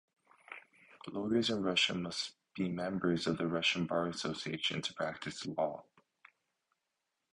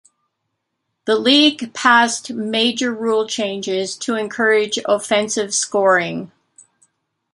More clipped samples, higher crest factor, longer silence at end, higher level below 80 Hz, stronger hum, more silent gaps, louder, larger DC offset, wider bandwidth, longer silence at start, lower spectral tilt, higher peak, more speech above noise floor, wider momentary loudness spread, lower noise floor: neither; about the same, 20 dB vs 18 dB; first, 1.5 s vs 1.05 s; about the same, -70 dBFS vs -68 dBFS; neither; neither; second, -35 LUFS vs -17 LUFS; neither; about the same, 11 kHz vs 11.5 kHz; second, 0.5 s vs 1.05 s; first, -4.5 dB/octave vs -2 dB/octave; second, -16 dBFS vs -2 dBFS; second, 51 dB vs 58 dB; first, 17 LU vs 9 LU; first, -86 dBFS vs -75 dBFS